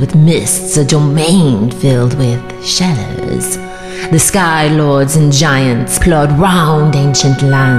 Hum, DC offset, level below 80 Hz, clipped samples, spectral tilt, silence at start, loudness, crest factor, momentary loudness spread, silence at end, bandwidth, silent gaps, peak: none; 2%; -28 dBFS; under 0.1%; -5 dB/octave; 0 s; -10 LUFS; 10 dB; 8 LU; 0 s; 15 kHz; none; 0 dBFS